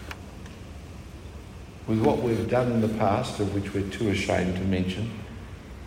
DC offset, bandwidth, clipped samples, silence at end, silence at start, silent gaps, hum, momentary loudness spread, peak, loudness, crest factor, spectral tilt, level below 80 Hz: under 0.1%; 16 kHz; under 0.1%; 0 s; 0 s; none; none; 19 LU; -8 dBFS; -26 LUFS; 20 dB; -6.5 dB/octave; -46 dBFS